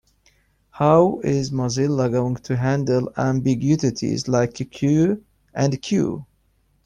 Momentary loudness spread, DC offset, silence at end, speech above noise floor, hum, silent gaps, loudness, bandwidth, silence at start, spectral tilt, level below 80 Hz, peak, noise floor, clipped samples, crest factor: 8 LU; under 0.1%; 0.6 s; 43 dB; none; none; -21 LUFS; 10 kHz; 0.75 s; -6.5 dB/octave; -52 dBFS; -4 dBFS; -63 dBFS; under 0.1%; 18 dB